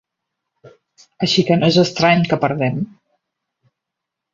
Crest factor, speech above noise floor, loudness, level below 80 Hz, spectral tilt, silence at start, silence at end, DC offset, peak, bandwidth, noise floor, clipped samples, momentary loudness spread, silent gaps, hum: 18 dB; 66 dB; -16 LUFS; -56 dBFS; -5.5 dB/octave; 0.65 s; 1.5 s; under 0.1%; -2 dBFS; 7.6 kHz; -82 dBFS; under 0.1%; 9 LU; none; none